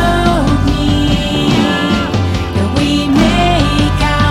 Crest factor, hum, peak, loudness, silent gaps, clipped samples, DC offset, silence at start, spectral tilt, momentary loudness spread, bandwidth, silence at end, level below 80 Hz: 12 dB; none; 0 dBFS; -12 LUFS; none; under 0.1%; under 0.1%; 0 s; -6 dB/octave; 4 LU; 15.5 kHz; 0 s; -20 dBFS